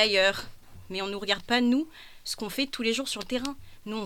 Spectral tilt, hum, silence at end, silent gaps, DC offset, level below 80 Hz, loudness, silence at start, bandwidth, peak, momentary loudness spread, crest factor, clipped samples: -3 dB/octave; none; 0 s; none; under 0.1%; -54 dBFS; -28 LUFS; 0 s; 18.5 kHz; -8 dBFS; 15 LU; 22 dB; under 0.1%